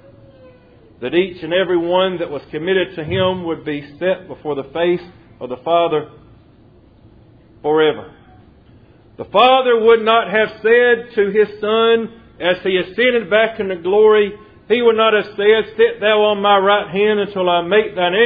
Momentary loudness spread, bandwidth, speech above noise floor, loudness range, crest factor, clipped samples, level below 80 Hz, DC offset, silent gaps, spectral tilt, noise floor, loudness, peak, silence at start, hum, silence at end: 12 LU; 5 kHz; 32 dB; 7 LU; 16 dB; under 0.1%; -52 dBFS; under 0.1%; none; -8 dB/octave; -47 dBFS; -16 LUFS; 0 dBFS; 1 s; none; 0 s